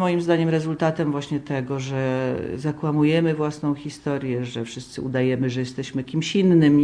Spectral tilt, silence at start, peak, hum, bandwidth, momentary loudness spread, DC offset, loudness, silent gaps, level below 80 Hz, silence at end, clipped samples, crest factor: -7 dB/octave; 0 s; -8 dBFS; none; 10.5 kHz; 9 LU; under 0.1%; -23 LUFS; none; -56 dBFS; 0 s; under 0.1%; 14 dB